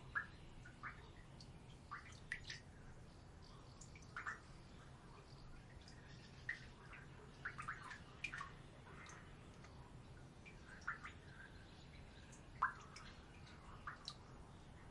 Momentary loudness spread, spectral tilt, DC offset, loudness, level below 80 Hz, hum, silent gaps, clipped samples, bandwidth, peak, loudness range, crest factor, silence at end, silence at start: 12 LU; -4 dB/octave; under 0.1%; -54 LUFS; -64 dBFS; none; none; under 0.1%; 11 kHz; -26 dBFS; 5 LU; 28 dB; 0 s; 0 s